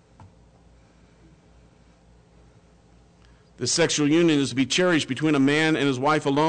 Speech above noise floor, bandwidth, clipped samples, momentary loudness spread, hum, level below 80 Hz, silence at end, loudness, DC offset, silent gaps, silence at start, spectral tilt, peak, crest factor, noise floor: 34 dB; 9.4 kHz; under 0.1%; 3 LU; none; -58 dBFS; 0 s; -21 LUFS; under 0.1%; none; 0.2 s; -4 dB/octave; -12 dBFS; 12 dB; -55 dBFS